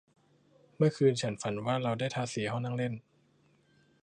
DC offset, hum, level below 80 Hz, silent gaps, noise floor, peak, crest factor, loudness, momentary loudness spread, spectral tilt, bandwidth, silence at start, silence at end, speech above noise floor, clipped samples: under 0.1%; none; -70 dBFS; none; -68 dBFS; -14 dBFS; 20 dB; -32 LUFS; 8 LU; -6 dB/octave; 10.5 kHz; 0.8 s; 1.05 s; 37 dB; under 0.1%